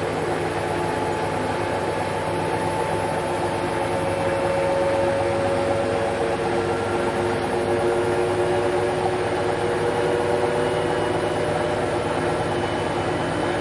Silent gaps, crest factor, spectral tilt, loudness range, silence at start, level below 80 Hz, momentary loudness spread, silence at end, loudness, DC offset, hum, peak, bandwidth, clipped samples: none; 14 dB; -5.5 dB/octave; 2 LU; 0 s; -46 dBFS; 3 LU; 0 s; -23 LUFS; under 0.1%; none; -8 dBFS; 11.5 kHz; under 0.1%